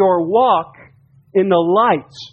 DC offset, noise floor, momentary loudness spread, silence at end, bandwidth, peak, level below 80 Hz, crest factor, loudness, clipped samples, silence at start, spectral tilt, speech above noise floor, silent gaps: under 0.1%; -49 dBFS; 7 LU; 0.05 s; 7 kHz; -2 dBFS; -60 dBFS; 14 dB; -15 LUFS; under 0.1%; 0 s; -7.5 dB/octave; 35 dB; none